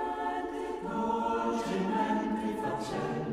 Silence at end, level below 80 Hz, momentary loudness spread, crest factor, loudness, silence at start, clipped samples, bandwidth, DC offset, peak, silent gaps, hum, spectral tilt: 0 s; -58 dBFS; 5 LU; 14 dB; -32 LUFS; 0 s; under 0.1%; 14.5 kHz; under 0.1%; -18 dBFS; none; none; -6 dB/octave